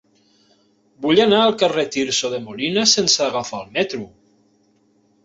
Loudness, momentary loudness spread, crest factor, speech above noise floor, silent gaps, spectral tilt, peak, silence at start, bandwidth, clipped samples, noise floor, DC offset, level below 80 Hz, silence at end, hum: -18 LUFS; 12 LU; 20 dB; 41 dB; none; -2.5 dB/octave; -2 dBFS; 1 s; 8 kHz; under 0.1%; -60 dBFS; under 0.1%; -62 dBFS; 1.2 s; none